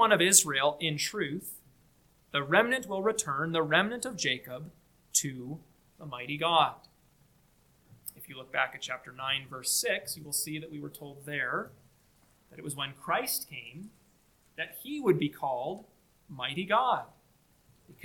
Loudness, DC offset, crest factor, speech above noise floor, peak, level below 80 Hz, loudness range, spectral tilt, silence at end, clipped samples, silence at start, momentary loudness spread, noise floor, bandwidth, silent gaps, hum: -29 LUFS; under 0.1%; 28 dB; 35 dB; -6 dBFS; -70 dBFS; 6 LU; -2.5 dB/octave; 0.1 s; under 0.1%; 0 s; 19 LU; -66 dBFS; 19 kHz; none; none